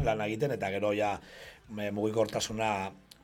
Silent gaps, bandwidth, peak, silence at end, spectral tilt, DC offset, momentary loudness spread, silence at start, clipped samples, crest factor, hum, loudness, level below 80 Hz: none; 17 kHz; -16 dBFS; 0.25 s; -5 dB/octave; under 0.1%; 12 LU; 0 s; under 0.1%; 18 dB; none; -32 LUFS; -54 dBFS